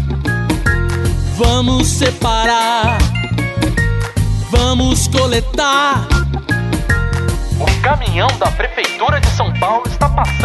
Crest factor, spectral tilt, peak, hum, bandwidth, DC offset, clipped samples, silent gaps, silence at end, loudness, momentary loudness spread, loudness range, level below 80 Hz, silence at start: 12 dB; -4.5 dB/octave; -2 dBFS; none; 12.5 kHz; under 0.1%; under 0.1%; none; 0 s; -15 LUFS; 5 LU; 1 LU; -20 dBFS; 0 s